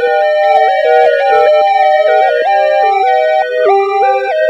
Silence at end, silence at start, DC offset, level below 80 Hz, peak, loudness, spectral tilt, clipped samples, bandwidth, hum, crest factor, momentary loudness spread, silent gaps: 0 s; 0 s; under 0.1%; -62 dBFS; 0 dBFS; -10 LUFS; -2.5 dB/octave; under 0.1%; 8.2 kHz; none; 10 dB; 2 LU; none